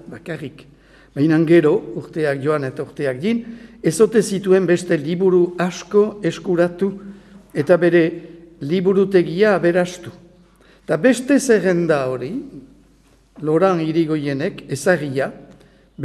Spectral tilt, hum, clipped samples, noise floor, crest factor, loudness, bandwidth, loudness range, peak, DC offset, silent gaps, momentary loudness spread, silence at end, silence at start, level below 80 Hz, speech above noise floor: -6.5 dB/octave; none; under 0.1%; -53 dBFS; 18 dB; -18 LUFS; 13 kHz; 3 LU; 0 dBFS; under 0.1%; none; 15 LU; 0 s; 0.05 s; -56 dBFS; 36 dB